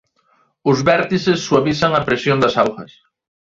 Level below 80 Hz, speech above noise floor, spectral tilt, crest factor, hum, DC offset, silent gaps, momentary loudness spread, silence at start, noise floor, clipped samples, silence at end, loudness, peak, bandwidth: -50 dBFS; 44 dB; -5.5 dB/octave; 16 dB; none; under 0.1%; none; 5 LU; 0.65 s; -60 dBFS; under 0.1%; 0.65 s; -16 LUFS; -2 dBFS; 7.8 kHz